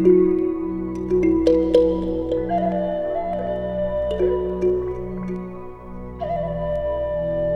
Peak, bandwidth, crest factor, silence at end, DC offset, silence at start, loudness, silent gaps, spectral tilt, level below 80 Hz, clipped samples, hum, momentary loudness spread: -4 dBFS; 6.4 kHz; 18 dB; 0 s; under 0.1%; 0 s; -22 LUFS; none; -9 dB/octave; -38 dBFS; under 0.1%; 60 Hz at -55 dBFS; 13 LU